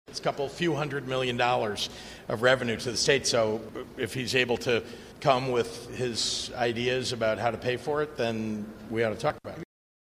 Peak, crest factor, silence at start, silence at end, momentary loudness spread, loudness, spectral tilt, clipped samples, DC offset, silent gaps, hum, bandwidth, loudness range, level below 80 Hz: -8 dBFS; 20 dB; 0.1 s; 0.45 s; 11 LU; -28 LUFS; -4 dB/octave; under 0.1%; under 0.1%; none; none; 15.5 kHz; 2 LU; -56 dBFS